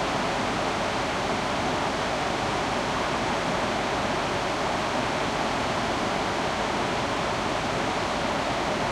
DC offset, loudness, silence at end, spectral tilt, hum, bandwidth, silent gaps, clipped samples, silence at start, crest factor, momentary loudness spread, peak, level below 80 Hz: under 0.1%; -26 LUFS; 0 s; -4 dB/octave; none; 15.5 kHz; none; under 0.1%; 0 s; 14 dB; 1 LU; -14 dBFS; -46 dBFS